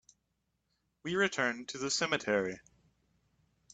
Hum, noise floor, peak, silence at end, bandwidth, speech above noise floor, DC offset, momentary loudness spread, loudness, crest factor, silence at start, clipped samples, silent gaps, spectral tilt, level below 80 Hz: none; -81 dBFS; -14 dBFS; 1.15 s; 9.4 kHz; 48 dB; under 0.1%; 11 LU; -33 LUFS; 22 dB; 1.05 s; under 0.1%; none; -3 dB/octave; -72 dBFS